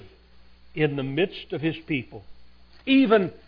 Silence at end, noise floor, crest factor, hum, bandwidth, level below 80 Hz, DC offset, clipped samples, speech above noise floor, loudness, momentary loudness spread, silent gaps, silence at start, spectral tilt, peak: 0.1 s; -52 dBFS; 20 dB; none; 5.2 kHz; -56 dBFS; under 0.1%; under 0.1%; 29 dB; -24 LUFS; 17 LU; none; 0 s; -9 dB/octave; -6 dBFS